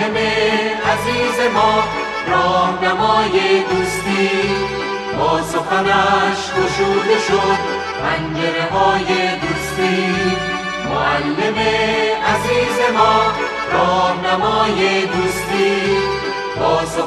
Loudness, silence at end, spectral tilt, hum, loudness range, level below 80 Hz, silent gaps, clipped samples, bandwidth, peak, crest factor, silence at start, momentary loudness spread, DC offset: -16 LUFS; 0 s; -4.5 dB/octave; none; 2 LU; -42 dBFS; none; under 0.1%; 13.5 kHz; 0 dBFS; 16 dB; 0 s; 5 LU; under 0.1%